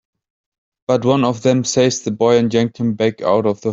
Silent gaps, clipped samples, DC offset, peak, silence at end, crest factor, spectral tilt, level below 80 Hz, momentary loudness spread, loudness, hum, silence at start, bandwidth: none; under 0.1%; under 0.1%; -2 dBFS; 0 s; 14 dB; -5.5 dB/octave; -56 dBFS; 4 LU; -16 LUFS; none; 0.9 s; 8 kHz